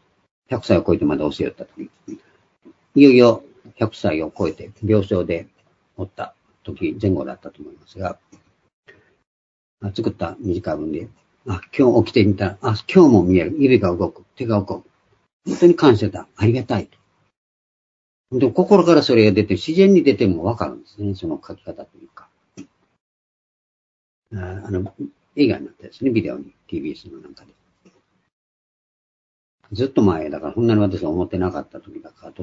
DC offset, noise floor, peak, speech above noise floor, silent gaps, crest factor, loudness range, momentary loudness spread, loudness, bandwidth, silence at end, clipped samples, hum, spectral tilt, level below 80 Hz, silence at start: under 0.1%; -58 dBFS; 0 dBFS; 40 dB; 8.73-8.83 s, 9.27-9.77 s, 15.33-15.40 s, 17.37-18.24 s, 23.01-24.22 s, 28.32-29.58 s; 20 dB; 15 LU; 23 LU; -18 LUFS; 7.8 kHz; 0 s; under 0.1%; none; -7.5 dB/octave; -52 dBFS; 0.5 s